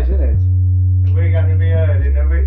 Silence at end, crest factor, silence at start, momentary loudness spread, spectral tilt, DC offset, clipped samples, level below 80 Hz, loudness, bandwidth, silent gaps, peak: 0 s; 6 dB; 0 s; 1 LU; -11.5 dB/octave; under 0.1%; under 0.1%; -18 dBFS; -14 LUFS; 3.6 kHz; none; -6 dBFS